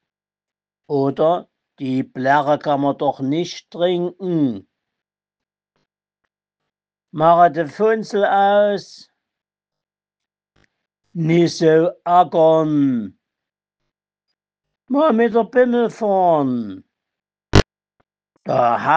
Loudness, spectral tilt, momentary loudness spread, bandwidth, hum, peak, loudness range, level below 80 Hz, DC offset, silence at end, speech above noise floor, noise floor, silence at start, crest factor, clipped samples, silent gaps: -17 LUFS; -6.5 dB/octave; 11 LU; 8.6 kHz; none; 0 dBFS; 6 LU; -42 dBFS; under 0.1%; 0 s; over 73 dB; under -90 dBFS; 0.9 s; 20 dB; under 0.1%; none